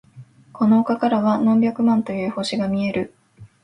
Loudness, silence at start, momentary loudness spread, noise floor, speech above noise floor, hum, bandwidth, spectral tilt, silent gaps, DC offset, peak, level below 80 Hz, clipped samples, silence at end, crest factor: -20 LUFS; 0.15 s; 7 LU; -45 dBFS; 27 dB; none; 10.5 kHz; -7 dB/octave; none; under 0.1%; -6 dBFS; -60 dBFS; under 0.1%; 0.15 s; 14 dB